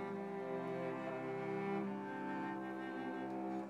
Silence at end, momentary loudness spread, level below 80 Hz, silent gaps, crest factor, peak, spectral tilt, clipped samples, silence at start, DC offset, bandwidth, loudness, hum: 0 s; 3 LU; under -90 dBFS; none; 14 dB; -28 dBFS; -7.5 dB/octave; under 0.1%; 0 s; under 0.1%; 12 kHz; -43 LUFS; none